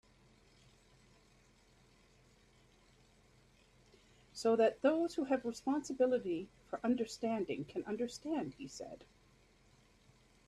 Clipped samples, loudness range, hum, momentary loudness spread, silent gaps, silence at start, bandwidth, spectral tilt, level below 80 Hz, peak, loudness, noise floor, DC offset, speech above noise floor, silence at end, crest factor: under 0.1%; 7 LU; none; 17 LU; none; 4.35 s; 13 kHz; -5 dB/octave; -72 dBFS; -18 dBFS; -37 LUFS; -68 dBFS; under 0.1%; 31 dB; 1.45 s; 22 dB